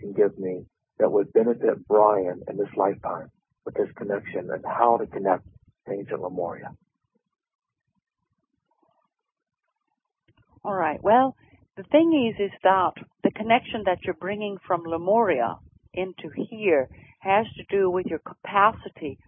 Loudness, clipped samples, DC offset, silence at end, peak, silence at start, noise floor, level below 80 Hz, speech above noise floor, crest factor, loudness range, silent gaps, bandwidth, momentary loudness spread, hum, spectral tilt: -24 LUFS; under 0.1%; under 0.1%; 0.15 s; -4 dBFS; 0 s; -80 dBFS; -60 dBFS; 56 dB; 22 dB; 11 LU; 7.55-7.59 s; 3.7 kHz; 14 LU; none; -10 dB/octave